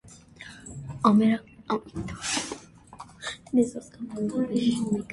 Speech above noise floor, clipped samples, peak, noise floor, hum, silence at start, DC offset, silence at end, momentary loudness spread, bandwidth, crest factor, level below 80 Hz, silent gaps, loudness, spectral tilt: 22 dB; under 0.1%; -8 dBFS; -48 dBFS; none; 0.05 s; under 0.1%; 0 s; 21 LU; 11.5 kHz; 20 dB; -56 dBFS; none; -27 LUFS; -5 dB/octave